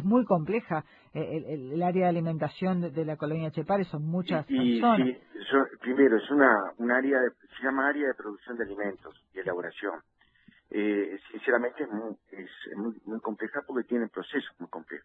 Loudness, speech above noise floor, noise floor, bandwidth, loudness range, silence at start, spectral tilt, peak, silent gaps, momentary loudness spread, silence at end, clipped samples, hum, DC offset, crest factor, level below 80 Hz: -29 LUFS; 33 dB; -61 dBFS; 4.6 kHz; 8 LU; 0 s; -9.5 dB/octave; -6 dBFS; none; 15 LU; 0.05 s; under 0.1%; none; under 0.1%; 22 dB; -70 dBFS